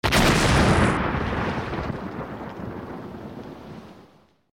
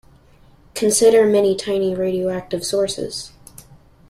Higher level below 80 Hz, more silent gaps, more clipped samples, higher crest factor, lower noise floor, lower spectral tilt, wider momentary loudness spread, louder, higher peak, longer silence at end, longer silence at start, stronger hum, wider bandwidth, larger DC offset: first, -34 dBFS vs -52 dBFS; neither; neither; about the same, 16 dB vs 16 dB; first, -55 dBFS vs -50 dBFS; about the same, -5 dB/octave vs -4 dB/octave; first, 21 LU vs 16 LU; second, -23 LUFS vs -18 LUFS; second, -8 dBFS vs -4 dBFS; second, 0.5 s vs 0.8 s; second, 0.05 s vs 0.75 s; neither; first, over 20 kHz vs 15 kHz; neither